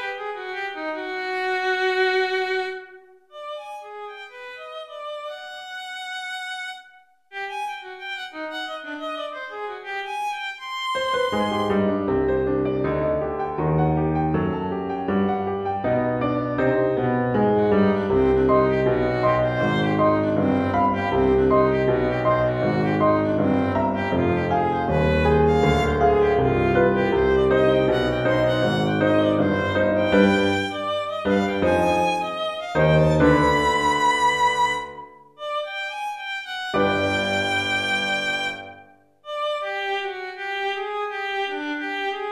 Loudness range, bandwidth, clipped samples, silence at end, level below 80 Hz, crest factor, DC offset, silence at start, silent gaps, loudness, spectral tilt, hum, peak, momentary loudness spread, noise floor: 12 LU; 13.5 kHz; under 0.1%; 0 s; -42 dBFS; 18 dB; under 0.1%; 0 s; none; -22 LUFS; -6 dB/octave; none; -4 dBFS; 14 LU; -53 dBFS